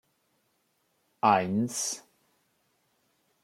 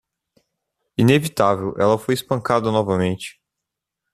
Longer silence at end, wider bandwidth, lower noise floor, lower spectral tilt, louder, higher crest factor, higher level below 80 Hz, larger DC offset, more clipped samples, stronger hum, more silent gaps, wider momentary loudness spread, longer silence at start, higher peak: first, 1.45 s vs 0.85 s; first, 16.5 kHz vs 14.5 kHz; second, -74 dBFS vs -83 dBFS; second, -4 dB/octave vs -6 dB/octave; second, -27 LUFS vs -20 LUFS; first, 24 dB vs 18 dB; second, -78 dBFS vs -56 dBFS; neither; neither; neither; neither; about the same, 9 LU vs 10 LU; first, 1.25 s vs 1 s; second, -10 dBFS vs -2 dBFS